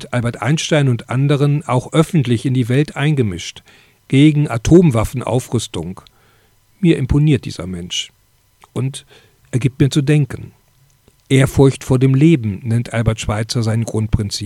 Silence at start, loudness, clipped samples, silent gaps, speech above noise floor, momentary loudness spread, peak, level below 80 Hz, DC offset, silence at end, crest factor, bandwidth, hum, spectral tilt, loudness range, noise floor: 0 s; -16 LUFS; under 0.1%; none; 39 dB; 13 LU; 0 dBFS; -36 dBFS; under 0.1%; 0 s; 16 dB; 13.5 kHz; none; -6.5 dB/octave; 5 LU; -54 dBFS